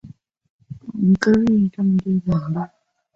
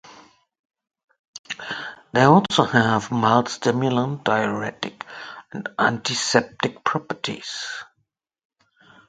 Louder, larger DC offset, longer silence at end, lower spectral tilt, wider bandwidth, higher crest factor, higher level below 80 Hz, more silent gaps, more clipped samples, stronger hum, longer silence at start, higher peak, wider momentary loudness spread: about the same, -19 LUFS vs -21 LUFS; neither; second, 0.5 s vs 1.25 s; first, -8 dB/octave vs -4.5 dB/octave; second, 7.6 kHz vs 9.4 kHz; second, 16 dB vs 24 dB; first, -50 dBFS vs -60 dBFS; second, 0.50-0.59 s vs 0.59-0.70 s, 1.04-1.08 s, 1.19-1.33 s, 1.39-1.44 s; neither; neither; about the same, 0.05 s vs 0.05 s; second, -4 dBFS vs 0 dBFS; about the same, 17 LU vs 16 LU